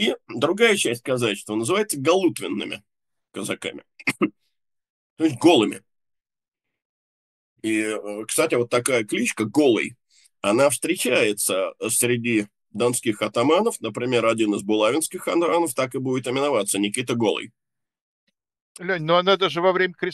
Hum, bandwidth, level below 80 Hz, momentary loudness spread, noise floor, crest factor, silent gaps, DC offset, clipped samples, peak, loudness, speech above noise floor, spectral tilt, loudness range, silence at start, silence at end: none; 13 kHz; -72 dBFS; 10 LU; -87 dBFS; 20 dB; 4.90-5.16 s, 6.48-6.52 s, 6.85-7.56 s, 18.01-18.27 s, 18.61-18.75 s; under 0.1%; under 0.1%; -2 dBFS; -22 LUFS; 65 dB; -3.5 dB/octave; 4 LU; 0 s; 0 s